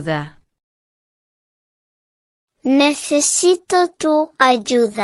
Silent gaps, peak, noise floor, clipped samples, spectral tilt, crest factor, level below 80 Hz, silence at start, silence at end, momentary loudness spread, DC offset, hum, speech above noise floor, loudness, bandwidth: 0.63-2.48 s; 0 dBFS; under -90 dBFS; under 0.1%; -3 dB/octave; 18 dB; -62 dBFS; 0 s; 0 s; 10 LU; under 0.1%; none; over 74 dB; -16 LUFS; 14 kHz